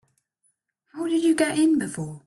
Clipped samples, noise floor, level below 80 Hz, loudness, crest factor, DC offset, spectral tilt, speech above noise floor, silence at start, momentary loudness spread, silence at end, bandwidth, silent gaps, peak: under 0.1%; -72 dBFS; -66 dBFS; -23 LUFS; 14 dB; under 0.1%; -5 dB/octave; 50 dB; 0.95 s; 12 LU; 0.1 s; 12 kHz; none; -10 dBFS